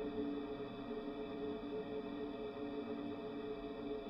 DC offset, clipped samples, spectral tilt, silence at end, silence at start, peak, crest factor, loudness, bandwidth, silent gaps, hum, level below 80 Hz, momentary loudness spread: under 0.1%; under 0.1%; -8 dB/octave; 0 s; 0 s; -30 dBFS; 14 dB; -45 LUFS; 5.8 kHz; none; none; -64 dBFS; 3 LU